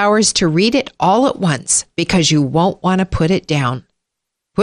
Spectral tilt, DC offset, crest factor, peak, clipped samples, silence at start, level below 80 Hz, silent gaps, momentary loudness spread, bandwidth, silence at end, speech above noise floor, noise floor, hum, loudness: -4 dB/octave; under 0.1%; 12 dB; -2 dBFS; under 0.1%; 0 s; -38 dBFS; none; 5 LU; 11 kHz; 0 s; 64 dB; -79 dBFS; none; -15 LUFS